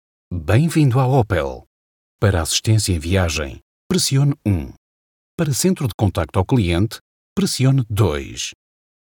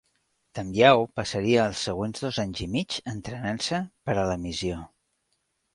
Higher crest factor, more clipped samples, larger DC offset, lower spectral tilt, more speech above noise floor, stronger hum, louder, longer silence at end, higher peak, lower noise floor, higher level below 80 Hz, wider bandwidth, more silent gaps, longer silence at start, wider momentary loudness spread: second, 18 dB vs 24 dB; neither; neither; about the same, -5.5 dB/octave vs -5 dB/octave; first, over 72 dB vs 49 dB; neither; first, -19 LUFS vs -26 LUFS; second, 0.5 s vs 0.9 s; first, 0 dBFS vs -4 dBFS; first, under -90 dBFS vs -75 dBFS; first, -38 dBFS vs -50 dBFS; first, 18 kHz vs 11.5 kHz; first, 1.67-2.19 s, 3.62-3.90 s, 4.77-5.38 s, 5.94-5.99 s, 7.01-7.36 s vs none; second, 0.3 s vs 0.55 s; about the same, 12 LU vs 14 LU